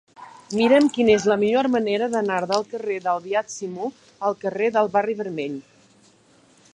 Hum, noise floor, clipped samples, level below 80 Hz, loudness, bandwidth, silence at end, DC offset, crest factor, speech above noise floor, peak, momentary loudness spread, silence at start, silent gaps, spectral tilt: none; -56 dBFS; under 0.1%; -62 dBFS; -22 LUFS; 10.5 kHz; 1.15 s; under 0.1%; 18 dB; 35 dB; -4 dBFS; 13 LU; 0.2 s; none; -5 dB/octave